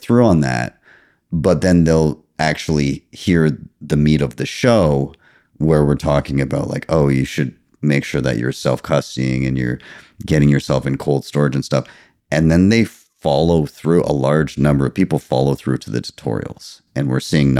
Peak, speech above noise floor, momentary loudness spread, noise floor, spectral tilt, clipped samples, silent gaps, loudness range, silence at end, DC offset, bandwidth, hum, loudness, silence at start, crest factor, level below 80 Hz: -2 dBFS; 35 dB; 10 LU; -51 dBFS; -7 dB/octave; under 0.1%; none; 2 LU; 0 s; under 0.1%; 14 kHz; none; -17 LUFS; 0 s; 16 dB; -38 dBFS